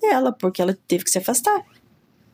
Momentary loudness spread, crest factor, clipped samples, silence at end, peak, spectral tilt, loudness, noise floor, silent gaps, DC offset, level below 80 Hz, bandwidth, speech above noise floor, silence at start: 4 LU; 16 dB; under 0.1%; 0.7 s; -6 dBFS; -3.5 dB/octave; -21 LUFS; -57 dBFS; none; under 0.1%; -68 dBFS; 16.5 kHz; 36 dB; 0 s